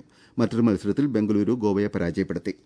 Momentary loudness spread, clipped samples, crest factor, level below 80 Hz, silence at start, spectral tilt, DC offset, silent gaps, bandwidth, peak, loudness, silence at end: 5 LU; under 0.1%; 16 dB; -56 dBFS; 0.35 s; -8 dB/octave; under 0.1%; none; 10.5 kHz; -8 dBFS; -24 LUFS; 0.15 s